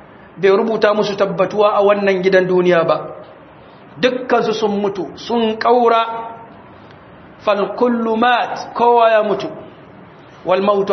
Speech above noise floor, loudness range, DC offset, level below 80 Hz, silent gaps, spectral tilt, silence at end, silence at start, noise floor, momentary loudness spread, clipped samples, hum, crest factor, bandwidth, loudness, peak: 26 dB; 3 LU; under 0.1%; -60 dBFS; none; -6 dB/octave; 0 s; 0.35 s; -41 dBFS; 11 LU; under 0.1%; none; 16 dB; 6.4 kHz; -15 LUFS; 0 dBFS